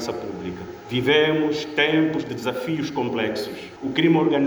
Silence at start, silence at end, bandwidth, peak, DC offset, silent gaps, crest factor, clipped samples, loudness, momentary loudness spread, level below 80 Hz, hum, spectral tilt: 0 s; 0 s; over 20 kHz; -6 dBFS; under 0.1%; none; 16 dB; under 0.1%; -22 LUFS; 14 LU; -60 dBFS; none; -5.5 dB/octave